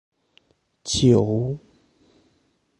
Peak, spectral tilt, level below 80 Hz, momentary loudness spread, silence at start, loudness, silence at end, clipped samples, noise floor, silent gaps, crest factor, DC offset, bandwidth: -4 dBFS; -6 dB/octave; -48 dBFS; 18 LU; 0.85 s; -20 LUFS; 1.2 s; under 0.1%; -66 dBFS; none; 20 dB; under 0.1%; 11.5 kHz